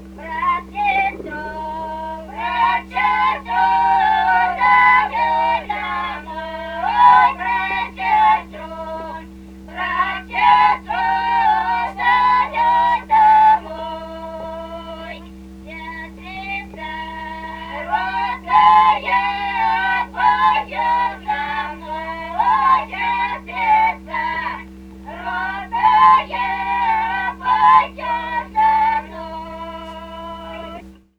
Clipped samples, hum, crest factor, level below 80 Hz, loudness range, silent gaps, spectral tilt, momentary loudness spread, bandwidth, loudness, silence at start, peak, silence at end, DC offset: under 0.1%; none; 18 dB; -42 dBFS; 6 LU; none; -4.5 dB/octave; 19 LU; 8.8 kHz; -17 LUFS; 0 s; 0 dBFS; 0.25 s; under 0.1%